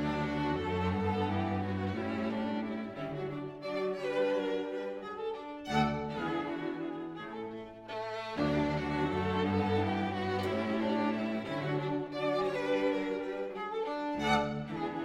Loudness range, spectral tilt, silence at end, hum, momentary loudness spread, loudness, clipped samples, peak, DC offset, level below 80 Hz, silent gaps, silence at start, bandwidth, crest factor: 4 LU; -7 dB/octave; 0 s; none; 8 LU; -34 LUFS; under 0.1%; -16 dBFS; under 0.1%; -58 dBFS; none; 0 s; 12.5 kHz; 18 dB